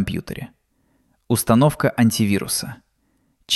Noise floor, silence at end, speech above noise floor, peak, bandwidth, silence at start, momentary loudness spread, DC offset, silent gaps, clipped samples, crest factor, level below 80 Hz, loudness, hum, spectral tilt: -65 dBFS; 0 s; 46 dB; -2 dBFS; 14.5 kHz; 0 s; 18 LU; under 0.1%; none; under 0.1%; 18 dB; -48 dBFS; -19 LUFS; none; -5 dB/octave